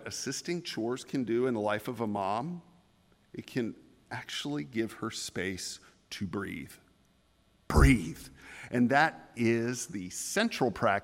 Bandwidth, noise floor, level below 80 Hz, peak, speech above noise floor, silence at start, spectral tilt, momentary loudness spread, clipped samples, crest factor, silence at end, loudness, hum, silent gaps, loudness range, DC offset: 16 kHz; -67 dBFS; -42 dBFS; -10 dBFS; 36 dB; 0 s; -5 dB/octave; 18 LU; under 0.1%; 22 dB; 0 s; -31 LUFS; none; none; 8 LU; under 0.1%